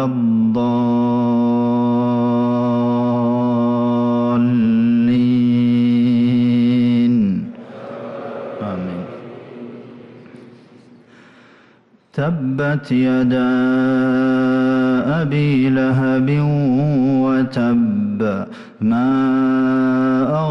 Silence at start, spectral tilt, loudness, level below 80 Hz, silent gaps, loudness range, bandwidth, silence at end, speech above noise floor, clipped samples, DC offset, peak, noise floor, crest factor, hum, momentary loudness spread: 0 s; -9.5 dB/octave; -16 LUFS; -54 dBFS; none; 15 LU; 6 kHz; 0 s; 36 dB; under 0.1%; under 0.1%; -8 dBFS; -52 dBFS; 8 dB; none; 14 LU